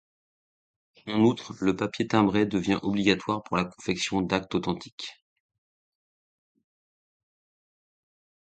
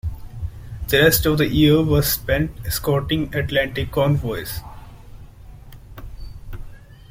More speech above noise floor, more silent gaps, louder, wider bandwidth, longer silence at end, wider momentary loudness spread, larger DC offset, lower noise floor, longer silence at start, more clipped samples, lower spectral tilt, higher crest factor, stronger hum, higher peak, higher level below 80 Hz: first, over 64 dB vs 22 dB; first, 4.92-4.98 s vs none; second, -26 LUFS vs -19 LUFS; second, 9.2 kHz vs 16.5 kHz; first, 3.4 s vs 0.25 s; second, 10 LU vs 24 LU; neither; first, under -90 dBFS vs -40 dBFS; first, 1.05 s vs 0.05 s; neither; about the same, -5.5 dB/octave vs -5 dB/octave; about the same, 22 dB vs 20 dB; neither; second, -6 dBFS vs -2 dBFS; second, -58 dBFS vs -34 dBFS